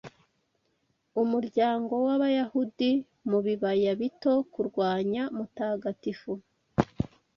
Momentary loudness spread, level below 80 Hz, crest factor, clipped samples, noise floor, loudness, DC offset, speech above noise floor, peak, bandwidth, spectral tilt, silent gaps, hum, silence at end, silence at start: 9 LU; -58 dBFS; 22 dB; under 0.1%; -74 dBFS; -29 LUFS; under 0.1%; 47 dB; -8 dBFS; 6.8 kHz; -8 dB/octave; none; none; 0.3 s; 0.05 s